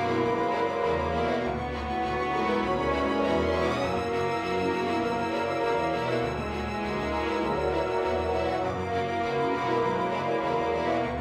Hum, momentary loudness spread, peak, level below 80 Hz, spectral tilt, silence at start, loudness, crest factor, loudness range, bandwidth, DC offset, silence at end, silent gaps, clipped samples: none; 3 LU; -14 dBFS; -44 dBFS; -6 dB/octave; 0 s; -28 LUFS; 14 dB; 1 LU; 12.5 kHz; under 0.1%; 0 s; none; under 0.1%